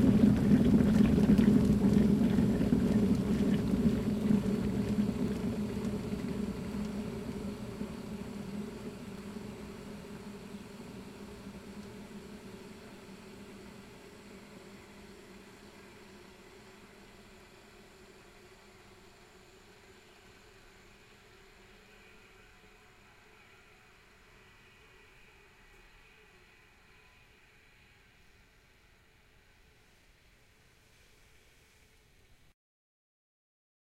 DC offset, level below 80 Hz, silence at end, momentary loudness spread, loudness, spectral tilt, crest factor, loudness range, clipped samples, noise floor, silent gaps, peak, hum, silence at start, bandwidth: under 0.1%; -50 dBFS; 16.95 s; 27 LU; -30 LUFS; -8 dB/octave; 22 dB; 29 LU; under 0.1%; -63 dBFS; none; -12 dBFS; none; 0 s; 14.5 kHz